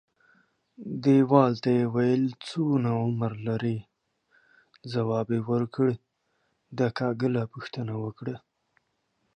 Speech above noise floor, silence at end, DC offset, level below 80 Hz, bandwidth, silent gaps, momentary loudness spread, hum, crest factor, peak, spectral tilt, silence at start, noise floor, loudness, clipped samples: 49 dB; 0.95 s; under 0.1%; -66 dBFS; 9.4 kHz; none; 16 LU; none; 22 dB; -4 dBFS; -8.5 dB/octave; 0.8 s; -75 dBFS; -27 LUFS; under 0.1%